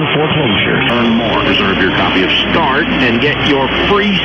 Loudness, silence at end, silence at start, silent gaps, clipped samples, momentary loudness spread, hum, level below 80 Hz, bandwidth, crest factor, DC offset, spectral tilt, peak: -11 LUFS; 0 s; 0 s; none; under 0.1%; 1 LU; none; -32 dBFS; 7.4 kHz; 10 dB; under 0.1%; -6.5 dB/octave; -2 dBFS